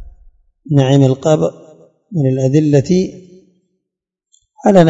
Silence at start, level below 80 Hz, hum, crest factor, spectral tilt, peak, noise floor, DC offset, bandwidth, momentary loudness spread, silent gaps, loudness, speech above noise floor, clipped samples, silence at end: 0 s; -48 dBFS; none; 14 dB; -7.5 dB/octave; 0 dBFS; -81 dBFS; under 0.1%; 7.8 kHz; 8 LU; none; -14 LUFS; 69 dB; 0.3%; 0 s